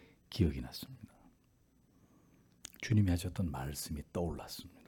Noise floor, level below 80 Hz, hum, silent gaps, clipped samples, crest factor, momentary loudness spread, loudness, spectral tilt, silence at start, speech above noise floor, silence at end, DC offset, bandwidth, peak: -70 dBFS; -54 dBFS; none; none; under 0.1%; 22 dB; 21 LU; -37 LUFS; -6 dB/octave; 0.3 s; 34 dB; 0.2 s; under 0.1%; 18 kHz; -16 dBFS